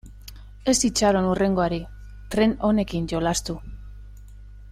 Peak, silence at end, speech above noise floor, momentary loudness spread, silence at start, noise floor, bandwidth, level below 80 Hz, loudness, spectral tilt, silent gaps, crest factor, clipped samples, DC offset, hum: -8 dBFS; 0 s; 20 dB; 23 LU; 0.05 s; -42 dBFS; 16 kHz; -40 dBFS; -23 LUFS; -4.5 dB/octave; none; 18 dB; under 0.1%; under 0.1%; 50 Hz at -40 dBFS